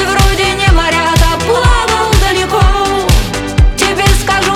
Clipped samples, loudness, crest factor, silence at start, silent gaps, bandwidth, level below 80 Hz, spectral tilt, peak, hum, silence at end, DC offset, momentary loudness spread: under 0.1%; -11 LUFS; 10 dB; 0 s; none; 16.5 kHz; -14 dBFS; -4 dB/octave; 0 dBFS; none; 0 s; under 0.1%; 3 LU